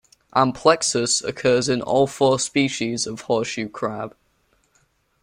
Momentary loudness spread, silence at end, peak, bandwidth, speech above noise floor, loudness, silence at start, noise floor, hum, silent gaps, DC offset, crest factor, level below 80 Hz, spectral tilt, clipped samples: 10 LU; 1.15 s; -2 dBFS; 16 kHz; 44 dB; -21 LUFS; 0.35 s; -64 dBFS; none; none; under 0.1%; 20 dB; -58 dBFS; -3.5 dB/octave; under 0.1%